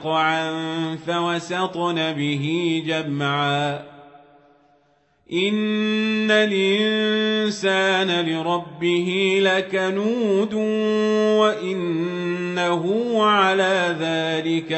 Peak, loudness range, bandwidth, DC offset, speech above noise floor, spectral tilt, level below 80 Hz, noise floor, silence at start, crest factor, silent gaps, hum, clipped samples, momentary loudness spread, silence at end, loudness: -6 dBFS; 5 LU; 8.4 kHz; under 0.1%; 41 dB; -5 dB/octave; -68 dBFS; -62 dBFS; 0 s; 16 dB; none; none; under 0.1%; 7 LU; 0 s; -21 LUFS